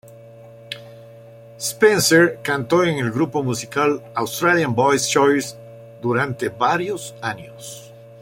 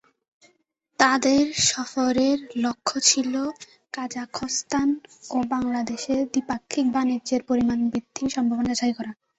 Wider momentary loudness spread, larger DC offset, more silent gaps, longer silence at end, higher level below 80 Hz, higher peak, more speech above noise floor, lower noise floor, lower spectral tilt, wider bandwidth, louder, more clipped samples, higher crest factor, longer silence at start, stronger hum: first, 19 LU vs 12 LU; neither; neither; second, 0 s vs 0.25 s; about the same, -60 dBFS vs -58 dBFS; about the same, -2 dBFS vs -4 dBFS; second, 23 dB vs 45 dB; second, -42 dBFS vs -69 dBFS; first, -4 dB/octave vs -2.5 dB/octave; first, 16.5 kHz vs 8.2 kHz; first, -19 LUFS vs -24 LUFS; neither; about the same, 18 dB vs 22 dB; second, 0.1 s vs 1 s; neither